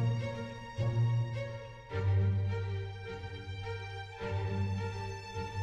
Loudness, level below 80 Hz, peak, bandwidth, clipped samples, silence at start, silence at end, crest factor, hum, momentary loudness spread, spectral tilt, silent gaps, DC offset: -36 LUFS; -54 dBFS; -22 dBFS; 7.6 kHz; under 0.1%; 0 s; 0 s; 12 dB; none; 12 LU; -7 dB/octave; none; under 0.1%